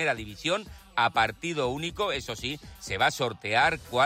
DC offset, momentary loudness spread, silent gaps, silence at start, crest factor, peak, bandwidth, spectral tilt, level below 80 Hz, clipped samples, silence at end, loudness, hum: under 0.1%; 10 LU; none; 0 s; 16 dB; -12 dBFS; 16 kHz; -3.5 dB/octave; -52 dBFS; under 0.1%; 0 s; -28 LUFS; none